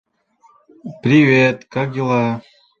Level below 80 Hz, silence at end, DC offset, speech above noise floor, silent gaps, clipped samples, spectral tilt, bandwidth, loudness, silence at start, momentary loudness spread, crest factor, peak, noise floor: -58 dBFS; 0.4 s; under 0.1%; 40 dB; none; under 0.1%; -7.5 dB/octave; 7.2 kHz; -16 LUFS; 0.85 s; 19 LU; 18 dB; 0 dBFS; -55 dBFS